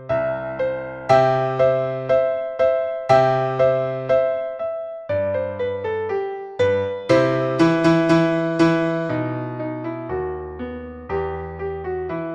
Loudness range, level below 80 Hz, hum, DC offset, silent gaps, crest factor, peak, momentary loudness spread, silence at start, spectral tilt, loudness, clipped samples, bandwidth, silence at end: 5 LU; -48 dBFS; none; under 0.1%; none; 18 dB; -2 dBFS; 12 LU; 0 s; -7.5 dB/octave; -21 LUFS; under 0.1%; 9.4 kHz; 0 s